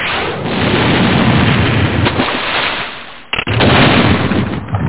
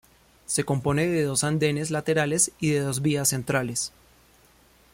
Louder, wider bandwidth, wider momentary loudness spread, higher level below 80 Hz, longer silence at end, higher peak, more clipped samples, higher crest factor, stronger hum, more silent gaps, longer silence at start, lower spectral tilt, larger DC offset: first, -12 LUFS vs -24 LUFS; second, 4 kHz vs 16.5 kHz; first, 10 LU vs 5 LU; first, -28 dBFS vs -56 dBFS; second, 0 s vs 1.05 s; first, 0 dBFS vs -8 dBFS; neither; second, 12 dB vs 18 dB; neither; neither; second, 0 s vs 0.5 s; first, -10 dB/octave vs -4 dB/octave; first, 2% vs under 0.1%